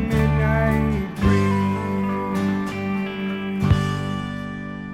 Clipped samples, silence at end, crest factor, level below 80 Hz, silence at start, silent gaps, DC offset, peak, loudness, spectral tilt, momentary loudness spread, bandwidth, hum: under 0.1%; 0 s; 16 dB; -32 dBFS; 0 s; none; under 0.1%; -6 dBFS; -22 LUFS; -7.5 dB/octave; 8 LU; 15 kHz; none